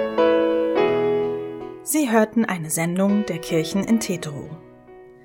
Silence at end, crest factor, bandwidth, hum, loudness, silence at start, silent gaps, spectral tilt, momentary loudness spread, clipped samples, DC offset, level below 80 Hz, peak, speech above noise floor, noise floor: 0.1 s; 16 dB; 17 kHz; none; -21 LUFS; 0 s; none; -5 dB/octave; 14 LU; under 0.1%; under 0.1%; -56 dBFS; -4 dBFS; 24 dB; -45 dBFS